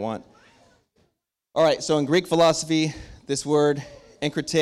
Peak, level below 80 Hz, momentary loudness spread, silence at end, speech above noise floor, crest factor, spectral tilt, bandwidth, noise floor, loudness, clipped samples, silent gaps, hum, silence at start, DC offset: -10 dBFS; -56 dBFS; 12 LU; 0 s; 52 dB; 14 dB; -4.5 dB/octave; 14 kHz; -74 dBFS; -23 LUFS; under 0.1%; none; none; 0 s; under 0.1%